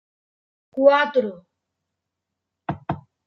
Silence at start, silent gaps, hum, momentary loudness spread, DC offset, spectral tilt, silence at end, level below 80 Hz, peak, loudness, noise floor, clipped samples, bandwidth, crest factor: 0.75 s; none; none; 17 LU; under 0.1%; -7 dB/octave; 0.25 s; -62 dBFS; -2 dBFS; -20 LUFS; -83 dBFS; under 0.1%; 6.2 kHz; 22 dB